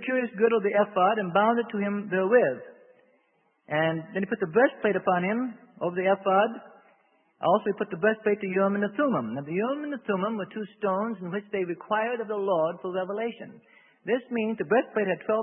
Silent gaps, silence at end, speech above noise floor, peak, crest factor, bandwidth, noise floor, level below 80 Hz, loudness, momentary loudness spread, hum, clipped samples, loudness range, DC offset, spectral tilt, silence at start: none; 0 s; 43 dB; -8 dBFS; 18 dB; 3.6 kHz; -69 dBFS; -76 dBFS; -27 LUFS; 9 LU; none; under 0.1%; 4 LU; under 0.1%; -10.5 dB/octave; 0 s